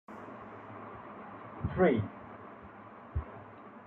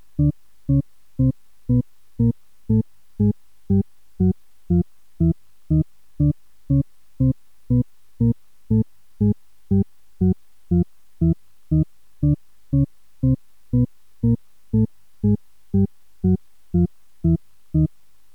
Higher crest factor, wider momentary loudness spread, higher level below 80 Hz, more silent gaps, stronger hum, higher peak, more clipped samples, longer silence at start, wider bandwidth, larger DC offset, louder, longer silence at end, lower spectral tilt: first, 22 dB vs 14 dB; first, 22 LU vs 8 LU; second, -52 dBFS vs -36 dBFS; neither; neither; second, -14 dBFS vs -8 dBFS; neither; about the same, 0.1 s vs 0.2 s; first, 4.2 kHz vs 1.8 kHz; second, under 0.1% vs 0.8%; second, -34 LUFS vs -23 LUFS; second, 0 s vs 0.5 s; second, -10 dB/octave vs -12.5 dB/octave